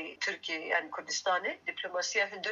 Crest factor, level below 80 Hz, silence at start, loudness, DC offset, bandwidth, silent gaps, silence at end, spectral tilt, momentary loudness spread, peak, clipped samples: 18 dB; -90 dBFS; 0 s; -33 LUFS; under 0.1%; 8 kHz; none; 0 s; 0 dB/octave; 5 LU; -16 dBFS; under 0.1%